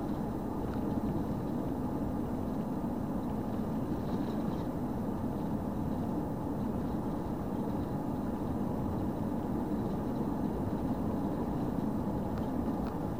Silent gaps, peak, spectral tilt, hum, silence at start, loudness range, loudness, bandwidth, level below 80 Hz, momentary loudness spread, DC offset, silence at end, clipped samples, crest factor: none; -22 dBFS; -9 dB/octave; none; 0 s; 1 LU; -35 LUFS; 16 kHz; -46 dBFS; 2 LU; 0.4%; 0 s; under 0.1%; 12 dB